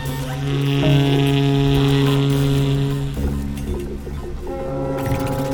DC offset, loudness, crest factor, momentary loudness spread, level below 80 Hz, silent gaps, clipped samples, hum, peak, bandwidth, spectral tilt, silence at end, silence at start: under 0.1%; -19 LUFS; 16 dB; 12 LU; -30 dBFS; none; under 0.1%; none; -4 dBFS; 19 kHz; -7 dB/octave; 0 s; 0 s